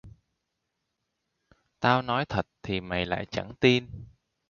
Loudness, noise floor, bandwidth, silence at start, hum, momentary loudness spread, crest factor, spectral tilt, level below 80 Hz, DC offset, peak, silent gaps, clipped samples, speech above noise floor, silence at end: -27 LUFS; -81 dBFS; 7.2 kHz; 0.05 s; none; 11 LU; 24 dB; -6 dB/octave; -54 dBFS; under 0.1%; -6 dBFS; none; under 0.1%; 54 dB; 0.45 s